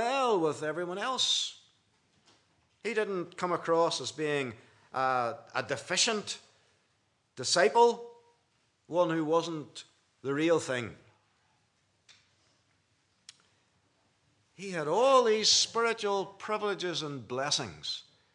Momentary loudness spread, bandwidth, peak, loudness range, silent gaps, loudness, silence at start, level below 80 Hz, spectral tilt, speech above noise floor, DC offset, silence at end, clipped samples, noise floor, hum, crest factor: 16 LU; 11 kHz; -10 dBFS; 8 LU; none; -29 LUFS; 0 s; -82 dBFS; -2.5 dB/octave; 44 dB; under 0.1%; 0.35 s; under 0.1%; -74 dBFS; none; 22 dB